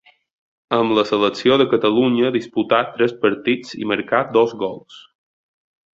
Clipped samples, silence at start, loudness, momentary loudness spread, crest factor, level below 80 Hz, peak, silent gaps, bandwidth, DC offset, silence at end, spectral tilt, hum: under 0.1%; 0.7 s; -18 LUFS; 7 LU; 18 dB; -60 dBFS; -2 dBFS; none; 7.8 kHz; under 0.1%; 0.95 s; -6 dB/octave; none